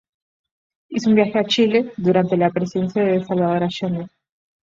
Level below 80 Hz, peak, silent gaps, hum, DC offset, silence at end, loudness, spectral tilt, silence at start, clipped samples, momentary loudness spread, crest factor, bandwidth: -60 dBFS; -4 dBFS; none; none; under 0.1%; 0.6 s; -19 LUFS; -6.5 dB/octave; 0.9 s; under 0.1%; 9 LU; 16 dB; 7.6 kHz